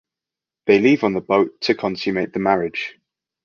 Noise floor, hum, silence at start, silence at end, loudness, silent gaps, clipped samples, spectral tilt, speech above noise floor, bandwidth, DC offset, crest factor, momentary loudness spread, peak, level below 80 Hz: -88 dBFS; none; 0.65 s; 0.55 s; -19 LUFS; none; under 0.1%; -6.5 dB/octave; 69 dB; 7 kHz; under 0.1%; 18 dB; 12 LU; -2 dBFS; -58 dBFS